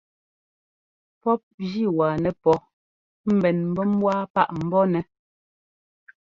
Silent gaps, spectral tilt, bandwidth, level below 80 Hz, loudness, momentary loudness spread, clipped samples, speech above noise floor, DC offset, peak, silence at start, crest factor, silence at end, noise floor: 1.43-1.58 s, 2.73-3.24 s, 4.30-4.34 s; -9 dB/octave; 7.2 kHz; -58 dBFS; -23 LUFS; 7 LU; under 0.1%; over 68 dB; under 0.1%; -6 dBFS; 1.25 s; 20 dB; 1.3 s; under -90 dBFS